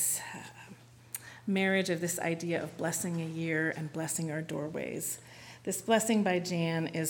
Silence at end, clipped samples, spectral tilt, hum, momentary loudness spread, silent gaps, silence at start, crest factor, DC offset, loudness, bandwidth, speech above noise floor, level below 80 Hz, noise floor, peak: 0 s; under 0.1%; -4 dB/octave; none; 15 LU; none; 0 s; 20 dB; under 0.1%; -32 LUFS; 19 kHz; 22 dB; -74 dBFS; -54 dBFS; -14 dBFS